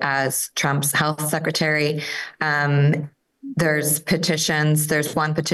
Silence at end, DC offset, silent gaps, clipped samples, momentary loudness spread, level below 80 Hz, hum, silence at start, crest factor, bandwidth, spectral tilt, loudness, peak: 0 s; under 0.1%; none; under 0.1%; 7 LU; -60 dBFS; none; 0 s; 14 dB; 13 kHz; -4 dB/octave; -20 LUFS; -8 dBFS